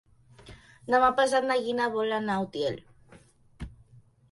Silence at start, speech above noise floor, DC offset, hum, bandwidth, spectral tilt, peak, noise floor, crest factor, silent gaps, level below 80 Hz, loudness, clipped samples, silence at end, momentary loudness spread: 0.45 s; 31 dB; under 0.1%; none; 11.5 kHz; -4.5 dB/octave; -10 dBFS; -57 dBFS; 20 dB; none; -56 dBFS; -26 LUFS; under 0.1%; 0.6 s; 23 LU